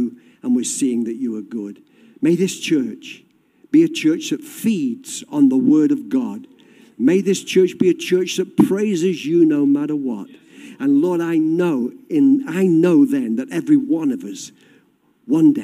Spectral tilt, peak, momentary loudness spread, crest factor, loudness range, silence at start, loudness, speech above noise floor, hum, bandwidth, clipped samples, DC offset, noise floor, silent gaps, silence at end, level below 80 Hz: -5.5 dB/octave; -2 dBFS; 13 LU; 16 dB; 3 LU; 0 s; -18 LUFS; 41 dB; none; 15 kHz; under 0.1%; under 0.1%; -58 dBFS; none; 0 s; -68 dBFS